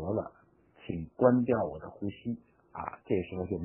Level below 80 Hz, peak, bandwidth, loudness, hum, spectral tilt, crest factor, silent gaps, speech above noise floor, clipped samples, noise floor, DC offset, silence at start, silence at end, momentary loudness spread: -58 dBFS; -10 dBFS; 3.2 kHz; -32 LUFS; none; -6 dB/octave; 24 dB; none; 32 dB; under 0.1%; -63 dBFS; under 0.1%; 0 s; 0 s; 17 LU